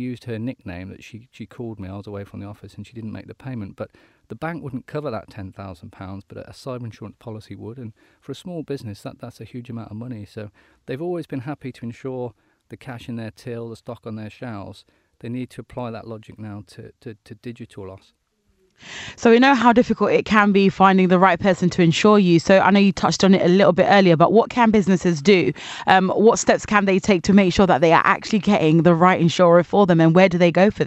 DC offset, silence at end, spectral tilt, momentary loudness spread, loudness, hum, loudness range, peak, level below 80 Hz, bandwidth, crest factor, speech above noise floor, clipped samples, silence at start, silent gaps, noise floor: under 0.1%; 0 s; -6 dB/octave; 23 LU; -16 LUFS; none; 19 LU; 0 dBFS; -50 dBFS; 8.6 kHz; 20 dB; 45 dB; under 0.1%; 0 s; none; -64 dBFS